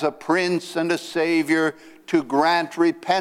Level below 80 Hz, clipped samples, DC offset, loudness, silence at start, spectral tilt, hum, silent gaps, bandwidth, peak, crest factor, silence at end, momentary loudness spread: -70 dBFS; under 0.1%; under 0.1%; -21 LUFS; 0 s; -4.5 dB/octave; none; none; 14.5 kHz; -6 dBFS; 16 dB; 0 s; 5 LU